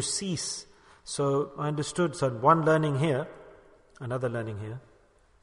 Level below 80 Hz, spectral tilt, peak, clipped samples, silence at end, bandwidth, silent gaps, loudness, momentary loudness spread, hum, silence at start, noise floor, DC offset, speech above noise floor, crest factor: -62 dBFS; -5 dB/octave; -8 dBFS; under 0.1%; 0.65 s; 11 kHz; none; -28 LUFS; 18 LU; none; 0 s; -61 dBFS; under 0.1%; 34 dB; 22 dB